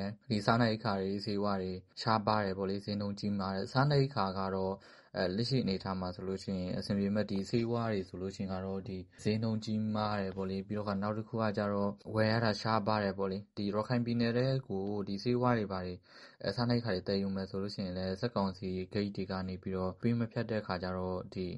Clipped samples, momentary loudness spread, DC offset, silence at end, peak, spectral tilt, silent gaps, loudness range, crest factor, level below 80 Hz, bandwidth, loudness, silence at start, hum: under 0.1%; 8 LU; under 0.1%; 0 s; -12 dBFS; -7 dB/octave; none; 3 LU; 22 dB; -64 dBFS; 11.5 kHz; -35 LUFS; 0 s; none